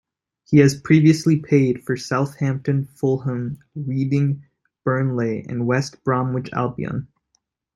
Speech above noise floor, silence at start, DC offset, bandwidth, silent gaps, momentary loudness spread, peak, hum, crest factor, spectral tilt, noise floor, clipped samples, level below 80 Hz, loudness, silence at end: 51 dB; 0.5 s; under 0.1%; 12 kHz; none; 12 LU; -2 dBFS; none; 18 dB; -7.5 dB/octave; -70 dBFS; under 0.1%; -58 dBFS; -21 LUFS; 0.7 s